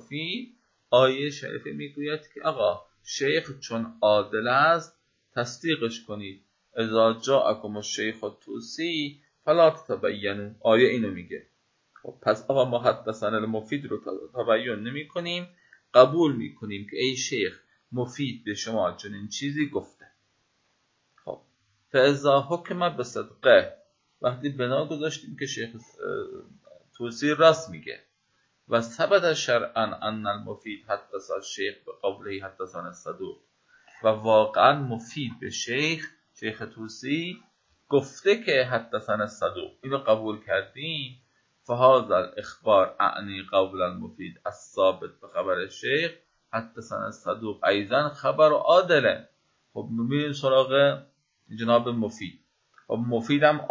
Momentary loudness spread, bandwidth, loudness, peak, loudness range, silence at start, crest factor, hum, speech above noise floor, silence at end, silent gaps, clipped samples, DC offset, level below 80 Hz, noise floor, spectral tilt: 17 LU; 7.6 kHz; -25 LUFS; -2 dBFS; 6 LU; 0.1 s; 24 dB; none; 46 dB; 0 s; none; under 0.1%; under 0.1%; -66 dBFS; -71 dBFS; -4.5 dB/octave